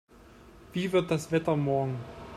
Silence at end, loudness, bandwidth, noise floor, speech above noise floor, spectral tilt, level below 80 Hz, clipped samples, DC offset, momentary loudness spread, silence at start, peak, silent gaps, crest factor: 0 s; -29 LUFS; 15 kHz; -53 dBFS; 25 dB; -6.5 dB/octave; -58 dBFS; under 0.1%; under 0.1%; 9 LU; 0.25 s; -14 dBFS; none; 18 dB